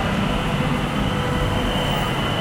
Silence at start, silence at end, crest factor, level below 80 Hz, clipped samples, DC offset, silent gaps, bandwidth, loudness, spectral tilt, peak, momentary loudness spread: 0 s; 0 s; 12 dB; -30 dBFS; under 0.1%; under 0.1%; none; 16.5 kHz; -22 LUFS; -5.5 dB/octave; -8 dBFS; 1 LU